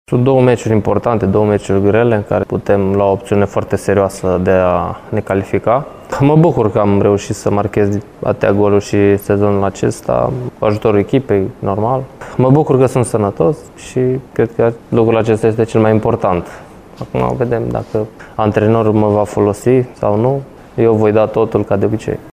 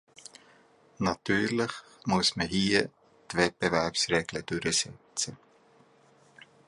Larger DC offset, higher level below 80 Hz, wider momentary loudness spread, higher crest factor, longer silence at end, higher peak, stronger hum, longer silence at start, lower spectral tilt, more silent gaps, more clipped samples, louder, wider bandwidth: neither; first, -40 dBFS vs -58 dBFS; second, 7 LU vs 10 LU; second, 14 dB vs 22 dB; second, 0 s vs 1.3 s; first, 0 dBFS vs -8 dBFS; neither; second, 0.1 s vs 1 s; first, -7.5 dB/octave vs -3.5 dB/octave; neither; neither; first, -14 LUFS vs -29 LUFS; first, 15 kHz vs 11.5 kHz